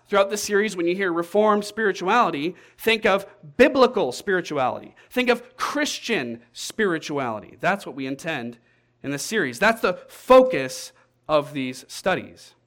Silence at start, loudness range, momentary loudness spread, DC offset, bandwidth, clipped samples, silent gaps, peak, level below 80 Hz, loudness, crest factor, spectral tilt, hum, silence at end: 0.1 s; 5 LU; 13 LU; under 0.1%; 17.5 kHz; under 0.1%; none; -4 dBFS; -56 dBFS; -22 LUFS; 18 dB; -4 dB/octave; none; 0.2 s